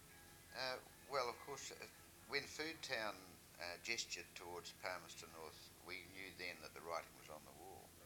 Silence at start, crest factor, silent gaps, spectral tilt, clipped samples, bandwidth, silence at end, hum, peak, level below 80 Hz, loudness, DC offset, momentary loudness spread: 0 s; 24 dB; none; -2 dB/octave; under 0.1%; 19 kHz; 0 s; none; -26 dBFS; -76 dBFS; -49 LUFS; under 0.1%; 13 LU